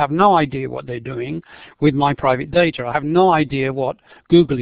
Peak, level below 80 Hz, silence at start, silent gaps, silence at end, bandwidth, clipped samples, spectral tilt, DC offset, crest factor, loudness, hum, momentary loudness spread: 0 dBFS; -46 dBFS; 0 s; none; 0 s; 5 kHz; under 0.1%; -11 dB/octave; under 0.1%; 16 dB; -18 LUFS; none; 13 LU